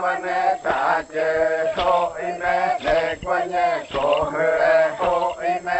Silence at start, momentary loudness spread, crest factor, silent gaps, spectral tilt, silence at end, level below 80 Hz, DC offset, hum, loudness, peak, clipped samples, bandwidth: 0 s; 5 LU; 16 dB; none; -4.5 dB/octave; 0 s; -48 dBFS; under 0.1%; none; -21 LUFS; -6 dBFS; under 0.1%; 8.4 kHz